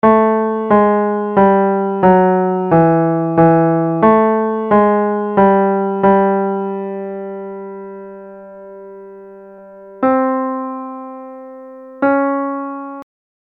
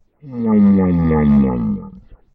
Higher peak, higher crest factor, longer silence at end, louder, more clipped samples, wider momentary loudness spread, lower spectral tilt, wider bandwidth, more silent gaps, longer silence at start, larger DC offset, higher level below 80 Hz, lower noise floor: first, 0 dBFS vs -4 dBFS; about the same, 14 dB vs 10 dB; about the same, 0.35 s vs 0.35 s; about the same, -14 LUFS vs -15 LUFS; neither; first, 22 LU vs 12 LU; about the same, -11.5 dB/octave vs -12.5 dB/octave; about the same, 3.9 kHz vs 3.7 kHz; neither; second, 0.05 s vs 0.25 s; neither; second, -50 dBFS vs -32 dBFS; about the same, -37 dBFS vs -39 dBFS